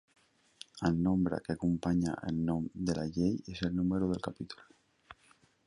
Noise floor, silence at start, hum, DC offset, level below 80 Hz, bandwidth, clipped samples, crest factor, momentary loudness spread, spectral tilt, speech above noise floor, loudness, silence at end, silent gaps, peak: -67 dBFS; 0.75 s; none; under 0.1%; -54 dBFS; 11 kHz; under 0.1%; 18 dB; 14 LU; -7 dB/octave; 34 dB; -33 LUFS; 0.55 s; none; -16 dBFS